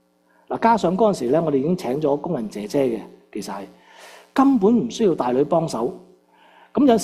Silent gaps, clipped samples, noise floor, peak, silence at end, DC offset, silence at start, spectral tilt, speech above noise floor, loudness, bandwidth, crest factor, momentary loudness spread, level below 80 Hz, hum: none; under 0.1%; -59 dBFS; -4 dBFS; 0 s; under 0.1%; 0.5 s; -6.5 dB/octave; 40 dB; -21 LUFS; 14 kHz; 18 dB; 14 LU; -58 dBFS; none